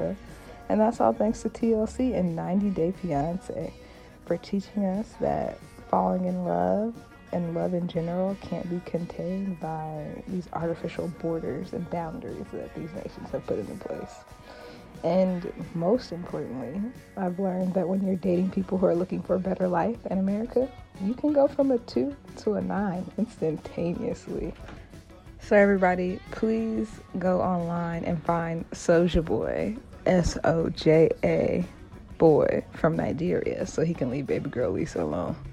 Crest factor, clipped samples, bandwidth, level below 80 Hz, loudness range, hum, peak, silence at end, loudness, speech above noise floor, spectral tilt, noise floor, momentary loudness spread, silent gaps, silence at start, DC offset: 20 dB; under 0.1%; 11 kHz; -48 dBFS; 8 LU; none; -8 dBFS; 0 s; -27 LUFS; 20 dB; -7.5 dB/octave; -47 dBFS; 13 LU; none; 0 s; under 0.1%